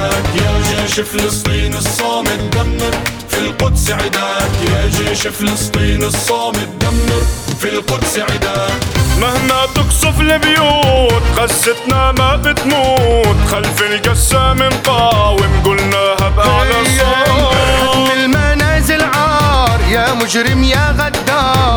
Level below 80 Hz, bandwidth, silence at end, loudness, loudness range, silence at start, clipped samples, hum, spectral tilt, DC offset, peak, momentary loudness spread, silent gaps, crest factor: -20 dBFS; over 20 kHz; 0 s; -12 LUFS; 4 LU; 0 s; under 0.1%; none; -4 dB/octave; under 0.1%; 0 dBFS; 5 LU; none; 12 dB